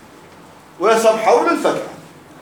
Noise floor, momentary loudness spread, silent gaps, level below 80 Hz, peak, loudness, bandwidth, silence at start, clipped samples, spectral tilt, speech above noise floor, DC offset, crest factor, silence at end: -42 dBFS; 11 LU; none; -66 dBFS; 0 dBFS; -15 LUFS; 19.5 kHz; 0.8 s; under 0.1%; -3.5 dB/octave; 28 dB; under 0.1%; 18 dB; 0.4 s